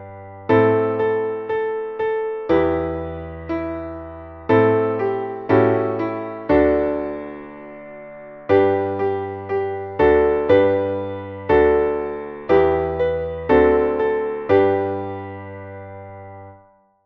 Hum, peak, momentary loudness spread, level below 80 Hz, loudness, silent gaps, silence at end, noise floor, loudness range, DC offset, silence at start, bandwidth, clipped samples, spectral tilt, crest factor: none; -2 dBFS; 20 LU; -42 dBFS; -19 LUFS; none; 0.5 s; -53 dBFS; 4 LU; under 0.1%; 0 s; 5.4 kHz; under 0.1%; -9.5 dB/octave; 16 dB